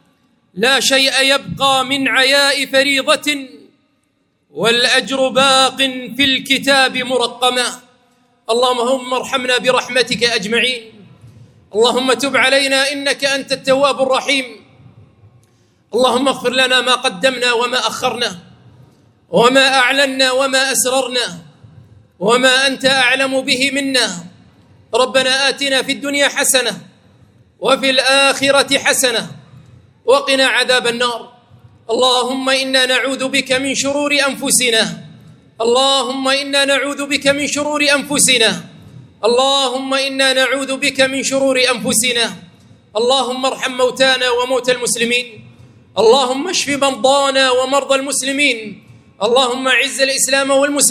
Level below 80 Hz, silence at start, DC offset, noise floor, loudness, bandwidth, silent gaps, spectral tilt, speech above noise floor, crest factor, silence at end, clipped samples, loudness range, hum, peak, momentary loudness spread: -60 dBFS; 0.55 s; under 0.1%; -63 dBFS; -13 LUFS; 16.5 kHz; none; -1.5 dB/octave; 48 dB; 16 dB; 0 s; under 0.1%; 3 LU; none; 0 dBFS; 7 LU